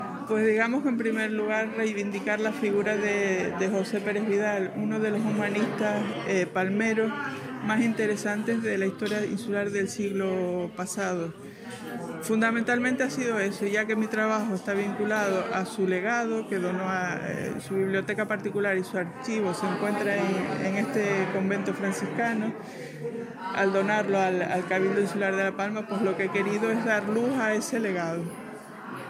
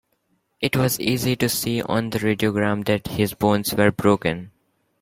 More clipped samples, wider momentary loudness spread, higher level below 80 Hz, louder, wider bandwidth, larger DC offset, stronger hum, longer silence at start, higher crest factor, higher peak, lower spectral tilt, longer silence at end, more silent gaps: neither; about the same, 7 LU vs 5 LU; second, -72 dBFS vs -52 dBFS; second, -27 LUFS vs -21 LUFS; about the same, 15.5 kHz vs 16.5 kHz; neither; neither; second, 0 s vs 0.6 s; about the same, 16 dB vs 20 dB; second, -12 dBFS vs -2 dBFS; about the same, -5.5 dB/octave vs -5 dB/octave; second, 0 s vs 0.55 s; neither